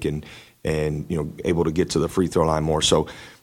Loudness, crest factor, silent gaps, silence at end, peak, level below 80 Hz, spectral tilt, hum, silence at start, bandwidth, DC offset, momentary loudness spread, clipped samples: -22 LUFS; 18 dB; none; 0.1 s; -4 dBFS; -40 dBFS; -5 dB/octave; none; 0 s; 16 kHz; under 0.1%; 12 LU; under 0.1%